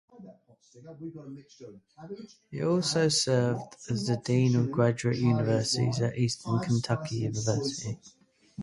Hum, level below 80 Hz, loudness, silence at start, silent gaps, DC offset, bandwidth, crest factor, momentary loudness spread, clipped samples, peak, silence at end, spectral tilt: none; -62 dBFS; -28 LUFS; 0.2 s; none; under 0.1%; 11.5 kHz; 18 dB; 20 LU; under 0.1%; -10 dBFS; 0 s; -5.5 dB/octave